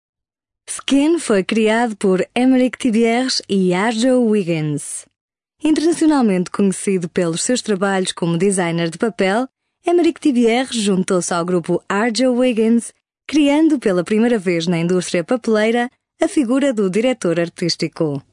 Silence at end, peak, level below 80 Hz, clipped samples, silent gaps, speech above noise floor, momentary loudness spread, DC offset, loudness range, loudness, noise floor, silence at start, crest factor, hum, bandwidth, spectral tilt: 0.1 s; -4 dBFS; -58 dBFS; under 0.1%; 5.21-5.29 s; 68 dB; 6 LU; under 0.1%; 2 LU; -17 LUFS; -85 dBFS; 0.7 s; 14 dB; none; 11 kHz; -5 dB/octave